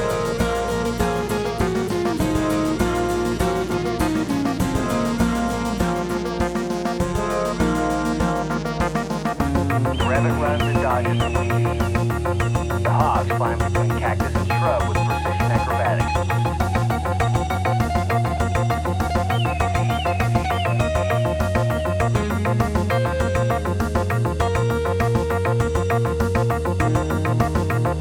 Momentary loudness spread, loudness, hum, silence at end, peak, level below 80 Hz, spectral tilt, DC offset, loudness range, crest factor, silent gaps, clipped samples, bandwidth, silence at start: 3 LU; -21 LUFS; none; 0 s; -4 dBFS; -32 dBFS; -6.5 dB/octave; 0.1%; 2 LU; 16 dB; none; under 0.1%; 18.5 kHz; 0 s